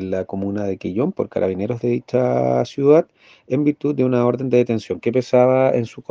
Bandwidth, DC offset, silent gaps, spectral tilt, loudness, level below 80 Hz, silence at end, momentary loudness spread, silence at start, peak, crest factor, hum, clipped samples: 7.4 kHz; under 0.1%; none; -8.5 dB/octave; -19 LUFS; -62 dBFS; 0.1 s; 9 LU; 0 s; -2 dBFS; 18 dB; none; under 0.1%